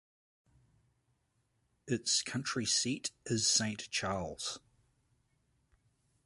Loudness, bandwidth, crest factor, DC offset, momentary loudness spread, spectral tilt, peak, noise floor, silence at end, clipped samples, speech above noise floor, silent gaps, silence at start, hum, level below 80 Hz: -33 LUFS; 11.5 kHz; 22 dB; under 0.1%; 11 LU; -2.5 dB/octave; -18 dBFS; -78 dBFS; 1.7 s; under 0.1%; 43 dB; none; 1.85 s; none; -66 dBFS